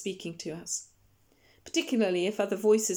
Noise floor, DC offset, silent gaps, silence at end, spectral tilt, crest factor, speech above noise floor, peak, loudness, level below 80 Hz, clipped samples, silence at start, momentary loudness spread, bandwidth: -66 dBFS; under 0.1%; none; 0 s; -3.5 dB/octave; 18 dB; 37 dB; -14 dBFS; -30 LUFS; -72 dBFS; under 0.1%; 0 s; 13 LU; 19.5 kHz